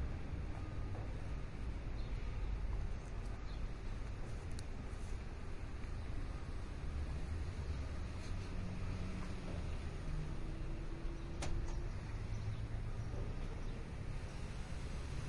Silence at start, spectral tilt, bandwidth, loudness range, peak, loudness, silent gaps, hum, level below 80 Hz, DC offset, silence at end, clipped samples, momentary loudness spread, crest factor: 0 s; -6.5 dB/octave; 11.5 kHz; 2 LU; -28 dBFS; -46 LUFS; none; none; -44 dBFS; under 0.1%; 0 s; under 0.1%; 3 LU; 14 dB